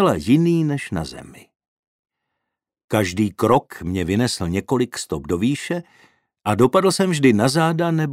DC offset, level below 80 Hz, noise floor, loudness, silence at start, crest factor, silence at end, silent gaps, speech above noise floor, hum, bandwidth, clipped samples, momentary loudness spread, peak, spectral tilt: under 0.1%; -48 dBFS; -81 dBFS; -20 LUFS; 0 s; 18 dB; 0 s; 1.68-2.03 s, 2.84-2.88 s; 62 dB; none; 16 kHz; under 0.1%; 11 LU; -2 dBFS; -6 dB/octave